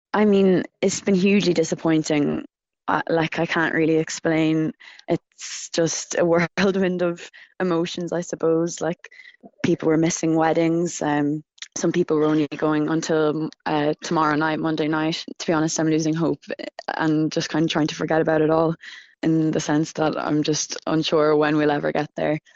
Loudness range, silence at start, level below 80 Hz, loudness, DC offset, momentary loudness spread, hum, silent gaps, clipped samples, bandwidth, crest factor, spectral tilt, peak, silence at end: 2 LU; 0.15 s; -58 dBFS; -22 LUFS; under 0.1%; 8 LU; none; none; under 0.1%; 8 kHz; 18 dB; -5 dB/octave; -4 dBFS; 0.15 s